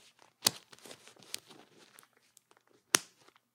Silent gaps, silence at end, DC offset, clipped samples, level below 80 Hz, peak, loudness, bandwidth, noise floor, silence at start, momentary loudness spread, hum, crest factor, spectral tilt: none; 0.55 s; under 0.1%; under 0.1%; -88 dBFS; 0 dBFS; -33 LUFS; 16.5 kHz; -68 dBFS; 0.45 s; 22 LU; none; 40 dB; 0 dB/octave